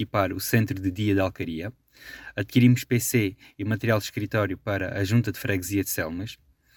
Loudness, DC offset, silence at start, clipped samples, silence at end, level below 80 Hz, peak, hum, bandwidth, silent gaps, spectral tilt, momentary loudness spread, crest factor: -25 LUFS; under 0.1%; 0 s; under 0.1%; 0.4 s; -56 dBFS; -6 dBFS; none; over 20 kHz; none; -5.5 dB/octave; 14 LU; 20 dB